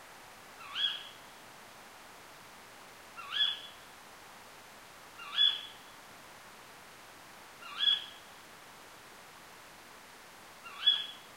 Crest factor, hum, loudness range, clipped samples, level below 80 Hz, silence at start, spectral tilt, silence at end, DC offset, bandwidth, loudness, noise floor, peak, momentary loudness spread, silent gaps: 24 dB; none; 5 LU; under 0.1%; -76 dBFS; 0 s; 0 dB/octave; 0 s; under 0.1%; 16 kHz; -30 LUFS; -53 dBFS; -16 dBFS; 24 LU; none